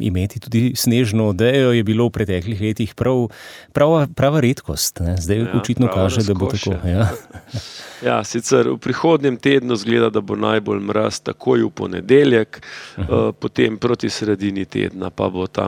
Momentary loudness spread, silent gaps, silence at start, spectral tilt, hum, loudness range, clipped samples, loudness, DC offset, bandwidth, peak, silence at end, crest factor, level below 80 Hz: 9 LU; none; 0 s; -6 dB/octave; none; 2 LU; under 0.1%; -18 LUFS; under 0.1%; 19 kHz; -2 dBFS; 0 s; 16 dB; -42 dBFS